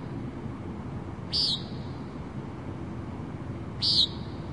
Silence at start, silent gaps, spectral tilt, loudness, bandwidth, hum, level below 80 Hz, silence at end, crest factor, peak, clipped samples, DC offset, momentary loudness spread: 0 s; none; -5 dB/octave; -30 LUFS; 11.5 kHz; none; -50 dBFS; 0 s; 20 dB; -12 dBFS; under 0.1%; 0.2%; 15 LU